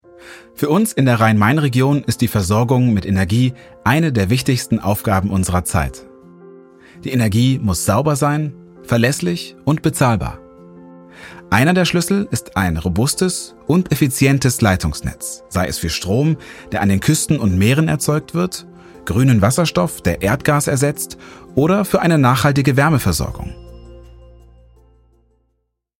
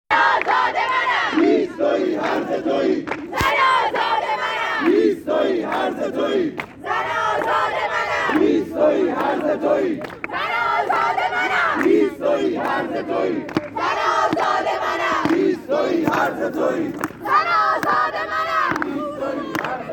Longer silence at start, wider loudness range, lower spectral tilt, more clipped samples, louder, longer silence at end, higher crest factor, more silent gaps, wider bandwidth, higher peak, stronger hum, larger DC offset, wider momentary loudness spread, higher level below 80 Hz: first, 0.25 s vs 0.1 s; about the same, 3 LU vs 1 LU; about the same, -5.5 dB/octave vs -5 dB/octave; neither; first, -16 LUFS vs -20 LUFS; first, 2 s vs 0 s; about the same, 14 dB vs 16 dB; neither; about the same, 17 kHz vs 17.5 kHz; about the same, -2 dBFS vs -4 dBFS; neither; neither; first, 10 LU vs 7 LU; first, -40 dBFS vs -54 dBFS